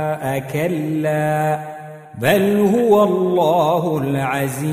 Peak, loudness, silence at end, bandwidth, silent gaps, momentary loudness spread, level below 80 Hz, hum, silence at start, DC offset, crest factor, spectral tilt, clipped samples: -2 dBFS; -17 LUFS; 0 s; 15.5 kHz; none; 8 LU; -56 dBFS; none; 0 s; under 0.1%; 16 dB; -6.5 dB/octave; under 0.1%